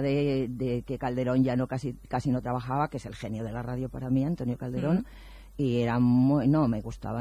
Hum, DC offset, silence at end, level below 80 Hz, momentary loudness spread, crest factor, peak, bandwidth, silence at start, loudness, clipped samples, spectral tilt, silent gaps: none; under 0.1%; 0 s; -48 dBFS; 11 LU; 14 dB; -14 dBFS; 10.5 kHz; 0 s; -28 LUFS; under 0.1%; -8.5 dB/octave; none